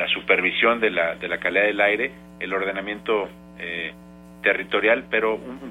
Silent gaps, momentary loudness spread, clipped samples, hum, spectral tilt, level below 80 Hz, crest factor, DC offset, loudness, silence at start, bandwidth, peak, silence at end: none; 12 LU; under 0.1%; none; -5 dB/octave; -56 dBFS; 20 dB; under 0.1%; -22 LUFS; 0 s; 12.5 kHz; -4 dBFS; 0 s